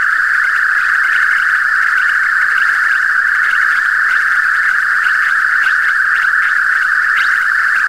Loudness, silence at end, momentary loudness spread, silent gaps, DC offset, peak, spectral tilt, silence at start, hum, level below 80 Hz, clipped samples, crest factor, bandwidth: -11 LUFS; 0 s; 1 LU; none; under 0.1%; -2 dBFS; 1.5 dB/octave; 0 s; none; -50 dBFS; under 0.1%; 12 dB; 16 kHz